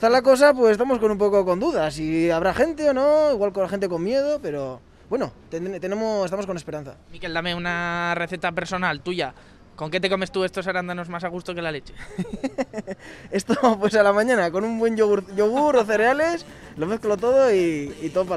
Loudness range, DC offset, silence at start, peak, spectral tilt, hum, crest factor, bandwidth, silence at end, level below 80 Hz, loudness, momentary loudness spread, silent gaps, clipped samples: 8 LU; under 0.1%; 0 s; -4 dBFS; -5.5 dB/octave; none; 18 dB; 13.5 kHz; 0 s; -50 dBFS; -22 LUFS; 13 LU; none; under 0.1%